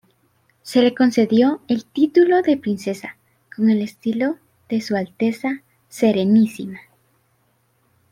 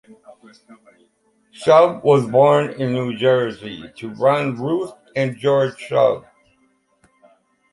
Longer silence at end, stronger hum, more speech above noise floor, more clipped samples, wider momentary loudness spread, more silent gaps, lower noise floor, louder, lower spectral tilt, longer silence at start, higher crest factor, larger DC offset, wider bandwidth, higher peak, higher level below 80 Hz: second, 1.3 s vs 1.55 s; neither; about the same, 46 dB vs 44 dB; neither; first, 18 LU vs 14 LU; neither; about the same, -63 dBFS vs -62 dBFS; about the same, -19 LUFS vs -18 LUFS; about the same, -6.5 dB/octave vs -7 dB/octave; first, 0.65 s vs 0.3 s; about the same, 16 dB vs 18 dB; neither; first, 14.5 kHz vs 11.5 kHz; about the same, -4 dBFS vs -2 dBFS; about the same, -66 dBFS vs -62 dBFS